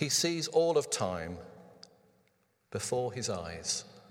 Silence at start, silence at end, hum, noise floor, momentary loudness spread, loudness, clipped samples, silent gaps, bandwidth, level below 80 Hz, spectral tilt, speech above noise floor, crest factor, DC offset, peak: 0 s; 0.1 s; none; -73 dBFS; 15 LU; -32 LUFS; under 0.1%; none; 17 kHz; -64 dBFS; -3 dB/octave; 40 dB; 20 dB; under 0.1%; -14 dBFS